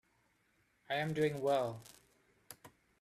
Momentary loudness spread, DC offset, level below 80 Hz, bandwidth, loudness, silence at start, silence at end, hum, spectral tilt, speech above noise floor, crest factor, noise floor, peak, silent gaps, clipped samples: 21 LU; under 0.1%; -76 dBFS; 15 kHz; -36 LUFS; 0.9 s; 0.35 s; none; -5.5 dB/octave; 40 dB; 18 dB; -75 dBFS; -22 dBFS; none; under 0.1%